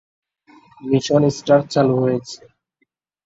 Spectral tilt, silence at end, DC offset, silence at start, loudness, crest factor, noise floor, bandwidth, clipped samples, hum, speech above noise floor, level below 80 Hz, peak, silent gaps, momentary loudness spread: -6.5 dB/octave; 0.9 s; under 0.1%; 0.85 s; -18 LUFS; 18 dB; -70 dBFS; 8 kHz; under 0.1%; none; 53 dB; -58 dBFS; -2 dBFS; none; 19 LU